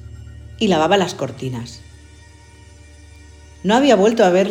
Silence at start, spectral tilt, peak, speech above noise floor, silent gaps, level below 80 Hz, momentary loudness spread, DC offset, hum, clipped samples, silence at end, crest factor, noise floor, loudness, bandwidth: 0.05 s; -5 dB/octave; -2 dBFS; 28 dB; none; -44 dBFS; 25 LU; under 0.1%; none; under 0.1%; 0 s; 18 dB; -43 dBFS; -16 LUFS; 16 kHz